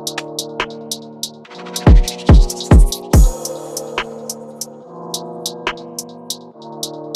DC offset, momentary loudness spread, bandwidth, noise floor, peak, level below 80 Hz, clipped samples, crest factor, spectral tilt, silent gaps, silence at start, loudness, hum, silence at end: under 0.1%; 17 LU; 15 kHz; -34 dBFS; -2 dBFS; -18 dBFS; under 0.1%; 14 dB; -5 dB/octave; none; 0 s; -18 LUFS; none; 0 s